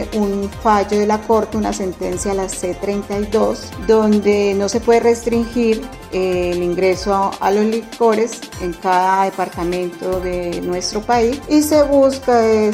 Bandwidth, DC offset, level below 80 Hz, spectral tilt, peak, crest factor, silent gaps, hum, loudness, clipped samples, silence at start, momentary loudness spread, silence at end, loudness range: 16 kHz; under 0.1%; -38 dBFS; -5 dB/octave; -2 dBFS; 14 dB; none; none; -17 LUFS; under 0.1%; 0 s; 8 LU; 0 s; 2 LU